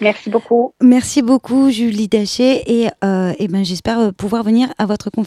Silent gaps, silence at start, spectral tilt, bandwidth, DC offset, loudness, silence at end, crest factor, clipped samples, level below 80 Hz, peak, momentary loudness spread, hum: none; 0 s; -5.5 dB/octave; 13.5 kHz; under 0.1%; -15 LUFS; 0 s; 14 dB; under 0.1%; -48 dBFS; -2 dBFS; 6 LU; none